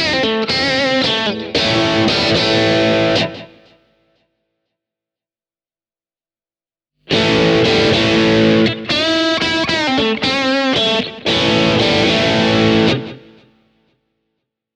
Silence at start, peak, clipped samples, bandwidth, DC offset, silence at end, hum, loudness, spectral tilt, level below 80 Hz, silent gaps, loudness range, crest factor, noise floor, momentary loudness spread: 0 s; 0 dBFS; under 0.1%; 10 kHz; under 0.1%; 1.6 s; none; -14 LUFS; -4.5 dB/octave; -44 dBFS; none; 6 LU; 16 dB; under -90 dBFS; 5 LU